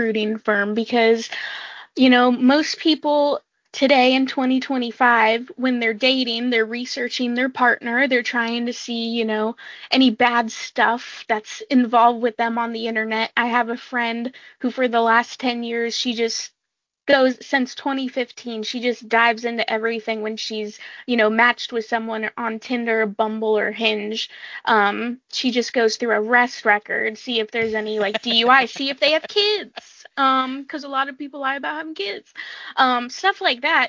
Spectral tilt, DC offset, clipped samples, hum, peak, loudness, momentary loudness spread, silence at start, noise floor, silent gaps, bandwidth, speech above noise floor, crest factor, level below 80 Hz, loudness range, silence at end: -3 dB/octave; under 0.1%; under 0.1%; none; 0 dBFS; -20 LUFS; 12 LU; 0 s; -82 dBFS; none; 7.6 kHz; 62 dB; 20 dB; -70 dBFS; 4 LU; 0 s